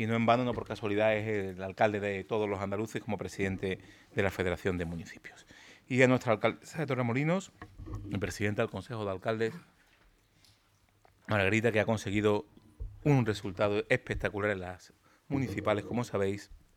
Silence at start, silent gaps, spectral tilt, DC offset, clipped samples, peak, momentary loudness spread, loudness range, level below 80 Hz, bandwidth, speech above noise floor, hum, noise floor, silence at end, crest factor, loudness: 0 s; none; -6.5 dB/octave; under 0.1%; under 0.1%; -8 dBFS; 15 LU; 5 LU; -56 dBFS; 16 kHz; 37 dB; none; -68 dBFS; 0.2 s; 24 dB; -32 LUFS